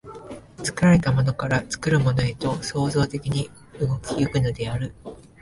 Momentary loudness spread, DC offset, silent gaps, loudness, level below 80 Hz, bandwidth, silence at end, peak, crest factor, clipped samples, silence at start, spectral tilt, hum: 17 LU; under 0.1%; none; -23 LUFS; -44 dBFS; 11.5 kHz; 0.2 s; -6 dBFS; 18 dB; under 0.1%; 0.05 s; -6 dB/octave; none